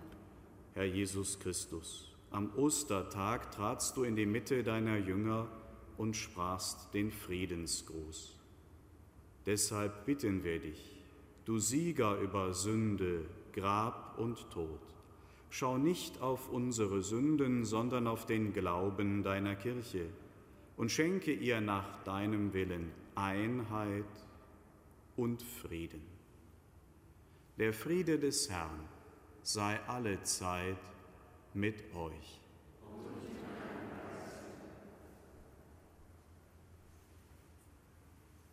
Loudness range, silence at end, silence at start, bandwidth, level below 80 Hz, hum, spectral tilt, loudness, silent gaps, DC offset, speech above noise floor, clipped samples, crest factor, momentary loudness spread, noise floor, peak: 11 LU; 0.15 s; 0 s; 16 kHz; -62 dBFS; none; -4.5 dB/octave; -38 LUFS; none; under 0.1%; 25 dB; under 0.1%; 20 dB; 19 LU; -62 dBFS; -20 dBFS